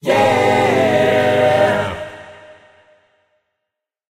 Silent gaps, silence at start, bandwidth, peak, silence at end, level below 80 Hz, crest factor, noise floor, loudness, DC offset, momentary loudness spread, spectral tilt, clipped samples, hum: none; 0.05 s; 16 kHz; -2 dBFS; 1.85 s; -52 dBFS; 14 dB; -80 dBFS; -14 LUFS; under 0.1%; 15 LU; -5.5 dB/octave; under 0.1%; none